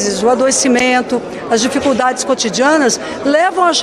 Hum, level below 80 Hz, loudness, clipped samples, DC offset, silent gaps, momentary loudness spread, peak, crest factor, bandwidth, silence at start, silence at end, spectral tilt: none; -50 dBFS; -13 LUFS; under 0.1%; under 0.1%; none; 5 LU; -2 dBFS; 12 dB; 13 kHz; 0 s; 0 s; -2.5 dB/octave